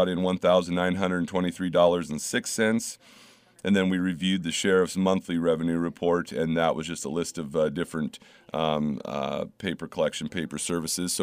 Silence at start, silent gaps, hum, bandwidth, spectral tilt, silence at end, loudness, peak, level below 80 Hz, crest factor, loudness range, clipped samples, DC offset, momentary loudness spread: 0 s; none; none; 15.5 kHz; -4.5 dB/octave; 0 s; -27 LUFS; -8 dBFS; -62 dBFS; 18 dB; 4 LU; under 0.1%; under 0.1%; 9 LU